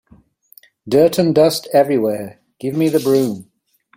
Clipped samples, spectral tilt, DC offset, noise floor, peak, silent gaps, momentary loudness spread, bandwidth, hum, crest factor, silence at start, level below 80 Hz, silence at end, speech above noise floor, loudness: under 0.1%; -6 dB/octave; under 0.1%; -50 dBFS; -2 dBFS; none; 14 LU; 16.5 kHz; none; 16 dB; 0.85 s; -58 dBFS; 0.55 s; 35 dB; -16 LUFS